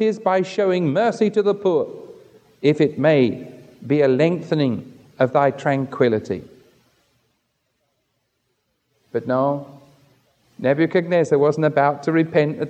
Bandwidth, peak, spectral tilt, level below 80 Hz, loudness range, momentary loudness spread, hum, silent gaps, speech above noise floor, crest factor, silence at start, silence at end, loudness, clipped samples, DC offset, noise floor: 8.8 kHz; -4 dBFS; -7.5 dB/octave; -68 dBFS; 9 LU; 12 LU; none; none; 53 dB; 18 dB; 0 s; 0 s; -19 LUFS; under 0.1%; under 0.1%; -71 dBFS